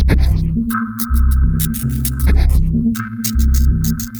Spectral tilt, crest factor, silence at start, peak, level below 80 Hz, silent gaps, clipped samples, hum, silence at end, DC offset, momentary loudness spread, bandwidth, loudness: -6 dB/octave; 14 dB; 0 s; 0 dBFS; -16 dBFS; none; under 0.1%; none; 0 s; under 0.1%; 5 LU; over 20 kHz; -16 LUFS